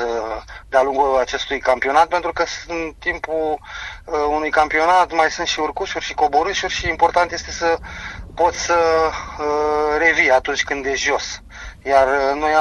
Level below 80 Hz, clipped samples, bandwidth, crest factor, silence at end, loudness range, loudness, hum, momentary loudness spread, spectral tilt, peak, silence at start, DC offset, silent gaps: -40 dBFS; under 0.1%; 11.5 kHz; 18 dB; 0 s; 2 LU; -18 LUFS; none; 11 LU; -2.5 dB/octave; 0 dBFS; 0 s; under 0.1%; none